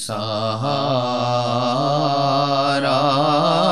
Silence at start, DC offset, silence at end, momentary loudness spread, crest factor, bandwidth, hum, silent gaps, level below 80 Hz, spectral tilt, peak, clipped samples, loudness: 0 s; 0.7%; 0 s; 5 LU; 14 dB; 13 kHz; none; none; -62 dBFS; -5.5 dB/octave; -4 dBFS; under 0.1%; -19 LUFS